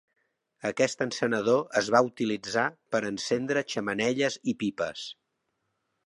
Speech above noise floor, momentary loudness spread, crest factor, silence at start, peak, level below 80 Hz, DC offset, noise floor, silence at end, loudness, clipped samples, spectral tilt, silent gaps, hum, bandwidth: 51 dB; 9 LU; 22 dB; 0.65 s; -8 dBFS; -70 dBFS; under 0.1%; -79 dBFS; 0.95 s; -28 LUFS; under 0.1%; -4 dB/octave; none; none; 11.5 kHz